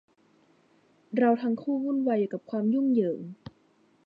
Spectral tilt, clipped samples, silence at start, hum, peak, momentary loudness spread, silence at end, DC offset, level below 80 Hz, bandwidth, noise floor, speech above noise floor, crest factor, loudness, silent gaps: -10 dB/octave; under 0.1%; 1.1 s; none; -12 dBFS; 11 LU; 0.7 s; under 0.1%; -74 dBFS; 5.2 kHz; -65 dBFS; 38 dB; 18 dB; -27 LUFS; none